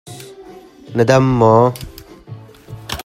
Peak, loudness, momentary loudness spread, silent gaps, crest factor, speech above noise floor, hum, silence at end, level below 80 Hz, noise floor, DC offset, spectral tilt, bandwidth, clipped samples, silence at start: 0 dBFS; -13 LUFS; 25 LU; none; 16 dB; 27 dB; none; 0 s; -42 dBFS; -39 dBFS; under 0.1%; -6.5 dB/octave; 16 kHz; under 0.1%; 0.05 s